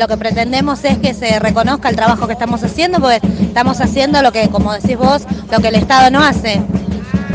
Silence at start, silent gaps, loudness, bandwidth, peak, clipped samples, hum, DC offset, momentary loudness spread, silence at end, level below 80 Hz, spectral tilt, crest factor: 0 s; none; -13 LUFS; 9.6 kHz; 0 dBFS; under 0.1%; none; under 0.1%; 7 LU; 0 s; -32 dBFS; -5.5 dB/octave; 12 dB